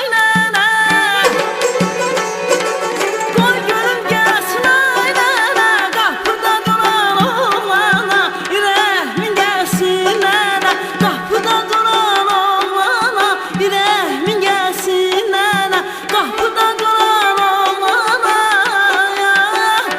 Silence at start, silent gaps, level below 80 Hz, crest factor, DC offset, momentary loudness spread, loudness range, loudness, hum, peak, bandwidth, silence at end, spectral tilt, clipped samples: 0 s; none; -54 dBFS; 14 dB; under 0.1%; 5 LU; 2 LU; -13 LUFS; none; 0 dBFS; 16.5 kHz; 0 s; -3 dB/octave; under 0.1%